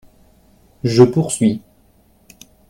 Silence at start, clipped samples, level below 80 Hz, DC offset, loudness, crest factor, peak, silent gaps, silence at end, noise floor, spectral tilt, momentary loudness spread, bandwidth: 0.85 s; under 0.1%; -52 dBFS; under 0.1%; -15 LUFS; 18 dB; 0 dBFS; none; 1.1 s; -54 dBFS; -6.5 dB/octave; 12 LU; 13.5 kHz